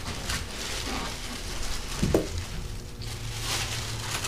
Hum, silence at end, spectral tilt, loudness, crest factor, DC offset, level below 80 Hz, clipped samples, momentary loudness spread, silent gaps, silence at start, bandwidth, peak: none; 0 s; -3.5 dB/octave; -31 LUFS; 24 dB; 0.5%; -38 dBFS; under 0.1%; 10 LU; none; 0 s; 15.5 kHz; -8 dBFS